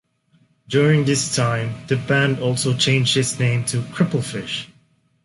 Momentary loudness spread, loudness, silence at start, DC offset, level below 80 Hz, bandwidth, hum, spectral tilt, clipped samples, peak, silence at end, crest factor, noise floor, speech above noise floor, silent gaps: 9 LU; -19 LUFS; 0.7 s; under 0.1%; -54 dBFS; 11.5 kHz; none; -4.5 dB/octave; under 0.1%; -4 dBFS; 0.6 s; 16 dB; -60 dBFS; 41 dB; none